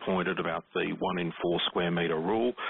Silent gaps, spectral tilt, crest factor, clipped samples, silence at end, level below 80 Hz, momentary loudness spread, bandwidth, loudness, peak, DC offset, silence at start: none; -3.5 dB/octave; 12 dB; under 0.1%; 0 s; -62 dBFS; 4 LU; 4.1 kHz; -30 LUFS; -18 dBFS; under 0.1%; 0 s